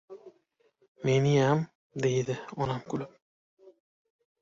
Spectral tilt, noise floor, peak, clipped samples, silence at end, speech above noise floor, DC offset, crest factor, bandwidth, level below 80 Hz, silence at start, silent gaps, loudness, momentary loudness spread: -6.5 dB/octave; -70 dBFS; -14 dBFS; under 0.1%; 1.35 s; 43 dB; under 0.1%; 18 dB; 7.6 kHz; -62 dBFS; 0.1 s; 0.88-0.95 s, 1.75-1.90 s; -29 LUFS; 18 LU